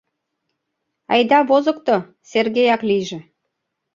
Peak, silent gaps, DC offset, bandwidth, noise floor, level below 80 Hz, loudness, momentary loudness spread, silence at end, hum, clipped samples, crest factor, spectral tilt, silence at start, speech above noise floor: -2 dBFS; none; under 0.1%; 7.6 kHz; -76 dBFS; -66 dBFS; -17 LUFS; 9 LU; 0.75 s; none; under 0.1%; 18 dB; -5 dB/octave; 1.1 s; 59 dB